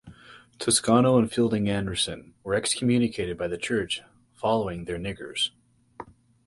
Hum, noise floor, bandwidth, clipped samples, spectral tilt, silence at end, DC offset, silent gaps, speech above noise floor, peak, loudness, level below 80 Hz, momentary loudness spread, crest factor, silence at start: none; -51 dBFS; 11.5 kHz; under 0.1%; -4 dB/octave; 0.35 s; under 0.1%; none; 26 dB; -6 dBFS; -25 LUFS; -52 dBFS; 13 LU; 20 dB; 0.05 s